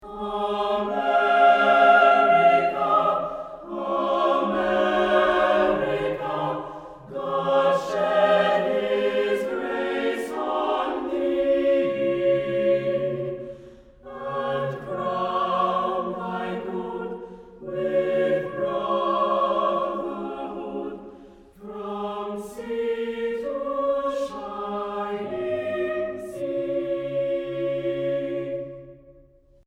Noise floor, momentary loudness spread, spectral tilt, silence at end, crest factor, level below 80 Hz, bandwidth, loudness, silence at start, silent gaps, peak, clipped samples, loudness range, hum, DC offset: -54 dBFS; 14 LU; -6 dB/octave; 0.55 s; 20 dB; -56 dBFS; 11.5 kHz; -24 LUFS; 0 s; none; -4 dBFS; under 0.1%; 9 LU; none; under 0.1%